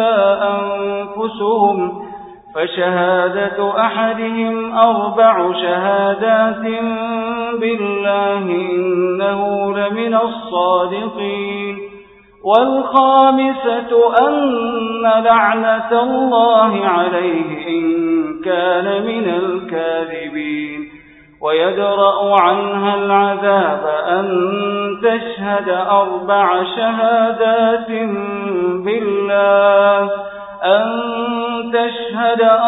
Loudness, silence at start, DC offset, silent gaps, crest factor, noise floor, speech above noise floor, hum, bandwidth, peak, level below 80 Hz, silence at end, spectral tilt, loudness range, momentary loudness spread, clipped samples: -15 LUFS; 0 s; under 0.1%; none; 14 dB; -42 dBFS; 27 dB; none; 4 kHz; 0 dBFS; -58 dBFS; 0 s; -8.5 dB/octave; 4 LU; 9 LU; under 0.1%